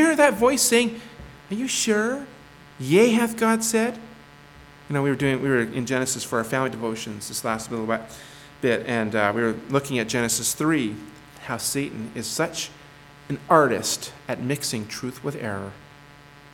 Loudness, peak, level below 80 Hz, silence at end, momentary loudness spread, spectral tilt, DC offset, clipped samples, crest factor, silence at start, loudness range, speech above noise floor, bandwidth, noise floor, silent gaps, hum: -23 LUFS; -2 dBFS; -56 dBFS; 0.05 s; 16 LU; -4 dB/octave; under 0.1%; under 0.1%; 22 dB; 0 s; 4 LU; 24 dB; 19 kHz; -48 dBFS; none; none